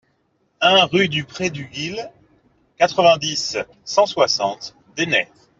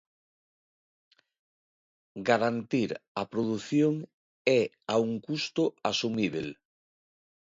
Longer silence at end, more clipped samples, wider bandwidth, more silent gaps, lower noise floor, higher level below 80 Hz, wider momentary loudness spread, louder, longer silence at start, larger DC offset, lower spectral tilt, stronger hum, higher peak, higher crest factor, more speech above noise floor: second, 0.35 s vs 1 s; neither; about the same, 7.8 kHz vs 7.8 kHz; second, none vs 3.08-3.15 s, 4.14-4.45 s; second, -65 dBFS vs under -90 dBFS; first, -60 dBFS vs -70 dBFS; first, 13 LU vs 10 LU; first, -18 LUFS vs -29 LUFS; second, 0.6 s vs 2.15 s; neither; second, -3 dB/octave vs -5.5 dB/octave; neither; first, -2 dBFS vs -10 dBFS; about the same, 18 dB vs 22 dB; second, 46 dB vs over 61 dB